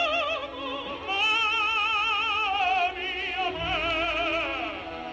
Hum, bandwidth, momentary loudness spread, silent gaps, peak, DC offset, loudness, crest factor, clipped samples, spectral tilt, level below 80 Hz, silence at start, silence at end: none; 8.8 kHz; 10 LU; none; -14 dBFS; under 0.1%; -26 LUFS; 14 dB; under 0.1%; -3 dB/octave; -50 dBFS; 0 s; 0 s